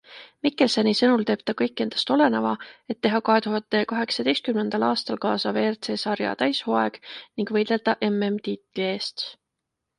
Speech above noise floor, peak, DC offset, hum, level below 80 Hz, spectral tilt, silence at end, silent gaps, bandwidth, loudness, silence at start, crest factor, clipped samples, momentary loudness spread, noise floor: 59 dB; -6 dBFS; under 0.1%; none; -70 dBFS; -5 dB/octave; 0.65 s; none; 11 kHz; -24 LUFS; 0.1 s; 18 dB; under 0.1%; 9 LU; -82 dBFS